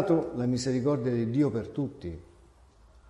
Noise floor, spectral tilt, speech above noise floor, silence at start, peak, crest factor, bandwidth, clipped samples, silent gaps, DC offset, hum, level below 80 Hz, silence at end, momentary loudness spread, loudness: -57 dBFS; -7 dB/octave; 29 dB; 0 s; -14 dBFS; 16 dB; 11 kHz; under 0.1%; none; under 0.1%; none; -54 dBFS; 0.85 s; 14 LU; -29 LUFS